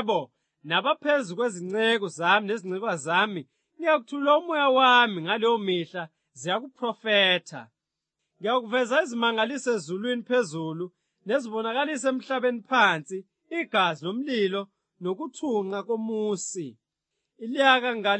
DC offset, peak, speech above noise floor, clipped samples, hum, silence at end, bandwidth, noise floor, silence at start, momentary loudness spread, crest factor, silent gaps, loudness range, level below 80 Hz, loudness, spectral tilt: under 0.1%; -4 dBFS; 59 dB; under 0.1%; none; 0 s; 8.8 kHz; -84 dBFS; 0 s; 15 LU; 22 dB; none; 5 LU; -88 dBFS; -25 LUFS; -3.5 dB/octave